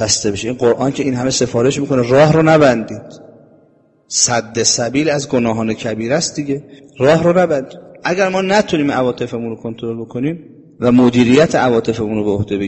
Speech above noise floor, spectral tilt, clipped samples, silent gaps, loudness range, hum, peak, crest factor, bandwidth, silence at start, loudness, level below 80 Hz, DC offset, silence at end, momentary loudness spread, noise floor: 38 dB; -4.5 dB/octave; under 0.1%; none; 3 LU; none; 0 dBFS; 14 dB; 8.6 kHz; 0 s; -15 LUFS; -46 dBFS; under 0.1%; 0 s; 13 LU; -52 dBFS